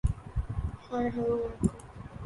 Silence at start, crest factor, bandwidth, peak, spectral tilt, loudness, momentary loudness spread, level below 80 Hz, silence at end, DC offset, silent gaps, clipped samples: 0.05 s; 20 dB; 11.5 kHz; -12 dBFS; -8 dB/octave; -33 LUFS; 9 LU; -38 dBFS; 0 s; under 0.1%; none; under 0.1%